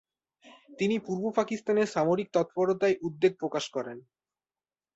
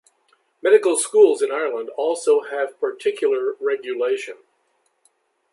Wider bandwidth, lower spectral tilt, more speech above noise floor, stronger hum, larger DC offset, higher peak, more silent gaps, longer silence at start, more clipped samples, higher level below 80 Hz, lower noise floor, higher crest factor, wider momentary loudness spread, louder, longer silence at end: second, 8 kHz vs 11.5 kHz; first, -5.5 dB/octave vs -1.5 dB/octave; first, over 62 dB vs 48 dB; neither; neither; second, -12 dBFS vs -2 dBFS; neither; about the same, 0.7 s vs 0.65 s; neither; first, -72 dBFS vs -82 dBFS; first, under -90 dBFS vs -67 dBFS; about the same, 18 dB vs 18 dB; about the same, 8 LU vs 10 LU; second, -29 LUFS vs -20 LUFS; second, 0.95 s vs 1.2 s